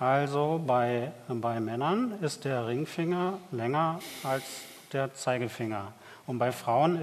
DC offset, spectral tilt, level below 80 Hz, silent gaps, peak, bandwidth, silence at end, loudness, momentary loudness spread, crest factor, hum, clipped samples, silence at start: under 0.1%; -6 dB/octave; -74 dBFS; none; -12 dBFS; 14 kHz; 0 s; -31 LUFS; 9 LU; 18 dB; none; under 0.1%; 0 s